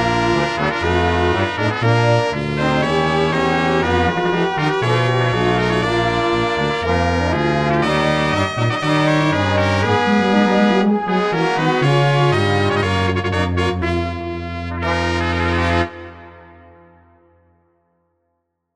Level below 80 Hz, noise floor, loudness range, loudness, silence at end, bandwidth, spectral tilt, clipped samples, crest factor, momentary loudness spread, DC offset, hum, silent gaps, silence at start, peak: -36 dBFS; -72 dBFS; 6 LU; -17 LUFS; 2.3 s; 11.5 kHz; -6 dB/octave; under 0.1%; 16 dB; 5 LU; under 0.1%; none; none; 0 s; -2 dBFS